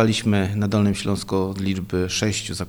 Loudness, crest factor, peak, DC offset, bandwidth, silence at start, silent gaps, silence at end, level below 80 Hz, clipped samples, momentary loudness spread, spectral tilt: -22 LUFS; 16 dB; -6 dBFS; under 0.1%; over 20 kHz; 0 s; none; 0 s; -46 dBFS; under 0.1%; 4 LU; -5 dB/octave